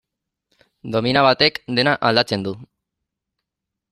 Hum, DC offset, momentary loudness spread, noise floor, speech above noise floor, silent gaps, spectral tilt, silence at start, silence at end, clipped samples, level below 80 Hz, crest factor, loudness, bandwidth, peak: none; under 0.1%; 15 LU; -83 dBFS; 65 dB; none; -5.5 dB/octave; 0.85 s; 1.25 s; under 0.1%; -56 dBFS; 20 dB; -18 LUFS; 14.5 kHz; -2 dBFS